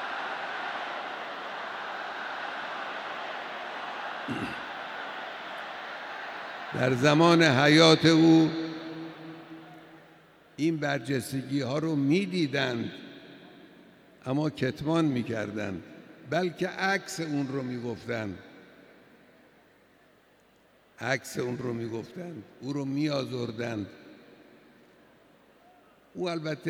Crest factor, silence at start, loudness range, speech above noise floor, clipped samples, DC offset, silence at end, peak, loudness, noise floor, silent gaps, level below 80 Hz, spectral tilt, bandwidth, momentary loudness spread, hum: 24 dB; 0 s; 15 LU; 35 dB; under 0.1%; under 0.1%; 0 s; -6 dBFS; -28 LUFS; -62 dBFS; none; -70 dBFS; -5.5 dB/octave; 14.5 kHz; 21 LU; none